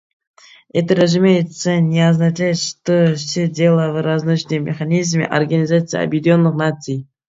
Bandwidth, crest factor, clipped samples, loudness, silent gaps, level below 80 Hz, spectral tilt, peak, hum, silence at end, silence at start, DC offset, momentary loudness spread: 7.8 kHz; 16 dB; under 0.1%; -16 LUFS; none; -60 dBFS; -6 dB/octave; 0 dBFS; none; 0.25 s; 0.75 s; under 0.1%; 6 LU